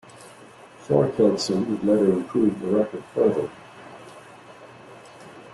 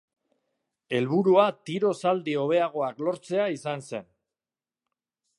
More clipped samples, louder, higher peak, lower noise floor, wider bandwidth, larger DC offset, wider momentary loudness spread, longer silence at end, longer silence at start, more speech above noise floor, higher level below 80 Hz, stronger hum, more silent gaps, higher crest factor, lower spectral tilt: neither; first, -22 LUFS vs -26 LUFS; about the same, -6 dBFS vs -6 dBFS; second, -47 dBFS vs under -90 dBFS; about the same, 12 kHz vs 11.5 kHz; neither; first, 24 LU vs 12 LU; second, 0 s vs 1.35 s; second, 0.2 s vs 0.9 s; second, 25 dB vs over 65 dB; first, -62 dBFS vs -78 dBFS; neither; neither; about the same, 18 dB vs 20 dB; about the same, -6.5 dB/octave vs -6.5 dB/octave